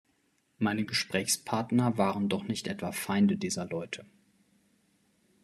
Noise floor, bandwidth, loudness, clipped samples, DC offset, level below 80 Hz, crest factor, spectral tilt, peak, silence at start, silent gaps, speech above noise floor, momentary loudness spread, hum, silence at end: -72 dBFS; 13 kHz; -30 LUFS; under 0.1%; under 0.1%; -72 dBFS; 20 dB; -4.5 dB/octave; -12 dBFS; 0.6 s; none; 42 dB; 8 LU; none; 1.4 s